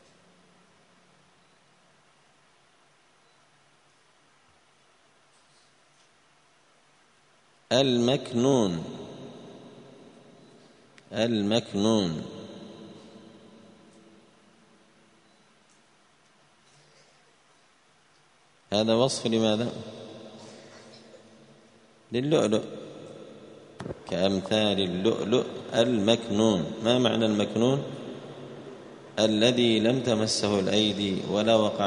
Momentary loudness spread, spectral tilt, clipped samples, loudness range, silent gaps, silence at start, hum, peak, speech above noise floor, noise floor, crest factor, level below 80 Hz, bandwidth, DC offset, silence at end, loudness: 23 LU; -5 dB/octave; under 0.1%; 7 LU; none; 7.7 s; none; -6 dBFS; 38 dB; -63 dBFS; 24 dB; -66 dBFS; 10.5 kHz; under 0.1%; 0 s; -25 LUFS